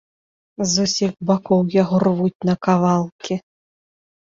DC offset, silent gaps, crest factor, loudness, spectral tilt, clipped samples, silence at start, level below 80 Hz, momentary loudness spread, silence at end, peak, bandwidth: under 0.1%; 2.35-2.40 s, 3.12-3.19 s; 16 dB; -19 LUFS; -5.5 dB/octave; under 0.1%; 0.6 s; -58 dBFS; 9 LU; 0.9 s; -4 dBFS; 7.8 kHz